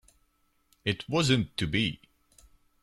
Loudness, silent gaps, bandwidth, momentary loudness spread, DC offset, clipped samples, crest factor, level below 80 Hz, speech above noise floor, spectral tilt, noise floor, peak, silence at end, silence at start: -29 LUFS; none; 14 kHz; 9 LU; under 0.1%; under 0.1%; 22 dB; -54 dBFS; 43 dB; -5 dB/octave; -70 dBFS; -10 dBFS; 0.85 s; 0.85 s